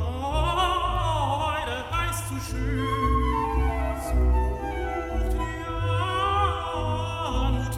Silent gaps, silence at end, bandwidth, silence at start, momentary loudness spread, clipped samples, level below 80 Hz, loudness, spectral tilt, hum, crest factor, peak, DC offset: none; 0 s; 15 kHz; 0 s; 6 LU; under 0.1%; -30 dBFS; -26 LUFS; -5.5 dB/octave; none; 14 dB; -12 dBFS; under 0.1%